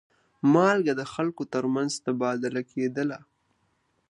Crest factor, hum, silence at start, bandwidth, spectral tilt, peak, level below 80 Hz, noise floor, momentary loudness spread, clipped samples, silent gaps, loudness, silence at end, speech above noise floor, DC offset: 20 dB; none; 0.45 s; 11 kHz; -6 dB/octave; -8 dBFS; -74 dBFS; -71 dBFS; 10 LU; under 0.1%; none; -26 LUFS; 0.9 s; 46 dB; under 0.1%